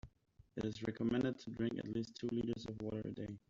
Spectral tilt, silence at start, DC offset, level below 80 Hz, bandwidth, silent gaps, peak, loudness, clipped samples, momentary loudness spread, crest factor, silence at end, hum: -6.5 dB/octave; 0.05 s; under 0.1%; -66 dBFS; 7.6 kHz; none; -26 dBFS; -42 LUFS; under 0.1%; 7 LU; 16 dB; 0.1 s; none